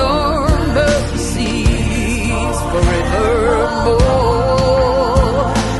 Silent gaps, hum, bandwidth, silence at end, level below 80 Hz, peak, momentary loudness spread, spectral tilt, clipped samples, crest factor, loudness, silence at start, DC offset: none; none; 12.5 kHz; 0 s; -20 dBFS; 0 dBFS; 4 LU; -5.5 dB/octave; under 0.1%; 12 dB; -15 LUFS; 0 s; under 0.1%